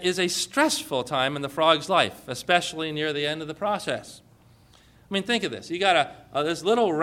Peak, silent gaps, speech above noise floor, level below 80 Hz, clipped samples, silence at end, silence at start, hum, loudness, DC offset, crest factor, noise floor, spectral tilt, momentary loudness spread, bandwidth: -4 dBFS; none; 30 dB; -62 dBFS; under 0.1%; 0 s; 0 s; none; -25 LUFS; under 0.1%; 22 dB; -55 dBFS; -3 dB/octave; 8 LU; 17 kHz